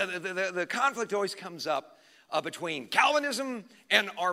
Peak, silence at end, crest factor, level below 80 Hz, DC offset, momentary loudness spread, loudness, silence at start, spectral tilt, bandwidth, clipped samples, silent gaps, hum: -6 dBFS; 0 s; 24 dB; -88 dBFS; under 0.1%; 10 LU; -29 LUFS; 0 s; -2.5 dB/octave; 16 kHz; under 0.1%; none; none